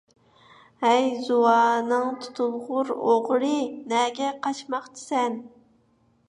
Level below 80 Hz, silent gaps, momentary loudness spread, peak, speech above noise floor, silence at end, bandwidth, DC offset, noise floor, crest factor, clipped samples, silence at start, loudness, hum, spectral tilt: -76 dBFS; none; 10 LU; -6 dBFS; 40 dB; 0.8 s; 11 kHz; under 0.1%; -64 dBFS; 18 dB; under 0.1%; 0.8 s; -24 LUFS; none; -3.5 dB/octave